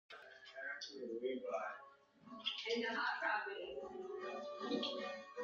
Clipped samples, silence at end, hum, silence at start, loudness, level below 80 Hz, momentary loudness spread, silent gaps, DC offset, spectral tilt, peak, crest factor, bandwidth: under 0.1%; 0 s; none; 0.1 s; -43 LUFS; -84 dBFS; 16 LU; none; under 0.1%; 0 dB/octave; -26 dBFS; 18 dB; 7.6 kHz